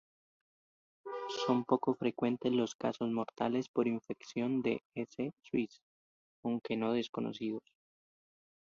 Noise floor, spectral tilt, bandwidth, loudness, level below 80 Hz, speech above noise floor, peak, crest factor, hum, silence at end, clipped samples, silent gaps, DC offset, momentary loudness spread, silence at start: under -90 dBFS; -6 dB/octave; 7.4 kHz; -36 LUFS; -78 dBFS; over 55 dB; -14 dBFS; 22 dB; none; 1.15 s; under 0.1%; 2.75-2.79 s, 3.68-3.74 s, 4.85-4.90 s, 5.83-6.43 s, 7.09-7.13 s; under 0.1%; 10 LU; 1.05 s